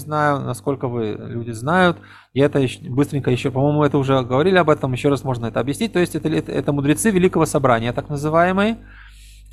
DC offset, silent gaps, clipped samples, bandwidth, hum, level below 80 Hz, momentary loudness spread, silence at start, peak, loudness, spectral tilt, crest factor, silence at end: under 0.1%; none; under 0.1%; 14.5 kHz; none; -44 dBFS; 8 LU; 0 s; -2 dBFS; -19 LUFS; -6 dB/octave; 16 dB; 0.1 s